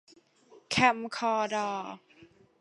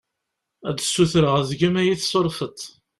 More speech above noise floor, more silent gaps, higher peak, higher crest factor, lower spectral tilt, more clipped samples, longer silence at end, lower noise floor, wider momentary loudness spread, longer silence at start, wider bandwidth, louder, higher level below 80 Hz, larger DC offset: second, 31 dB vs 60 dB; neither; about the same, -8 dBFS vs -6 dBFS; first, 24 dB vs 16 dB; second, -3.5 dB/octave vs -5 dB/octave; neither; about the same, 0.35 s vs 0.3 s; second, -60 dBFS vs -80 dBFS; first, 16 LU vs 13 LU; about the same, 0.55 s vs 0.65 s; second, 11.5 kHz vs 13.5 kHz; second, -29 LUFS vs -21 LUFS; second, -68 dBFS vs -52 dBFS; neither